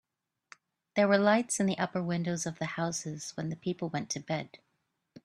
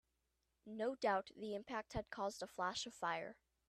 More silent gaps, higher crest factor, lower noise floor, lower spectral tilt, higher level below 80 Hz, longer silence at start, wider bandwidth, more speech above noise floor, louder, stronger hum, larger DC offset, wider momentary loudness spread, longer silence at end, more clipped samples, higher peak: neither; about the same, 22 dB vs 20 dB; second, -80 dBFS vs -86 dBFS; about the same, -4.5 dB/octave vs -3.5 dB/octave; about the same, -72 dBFS vs -68 dBFS; first, 0.95 s vs 0.65 s; second, 12.5 kHz vs 14 kHz; first, 49 dB vs 42 dB; first, -31 LUFS vs -44 LUFS; neither; neither; first, 12 LU vs 8 LU; first, 0.8 s vs 0.35 s; neither; first, -10 dBFS vs -26 dBFS